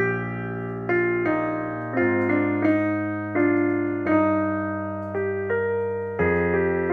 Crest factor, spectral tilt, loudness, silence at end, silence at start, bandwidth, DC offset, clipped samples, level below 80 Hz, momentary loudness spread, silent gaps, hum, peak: 14 dB; -10 dB/octave; -24 LUFS; 0 s; 0 s; 4.4 kHz; under 0.1%; under 0.1%; -54 dBFS; 7 LU; none; none; -8 dBFS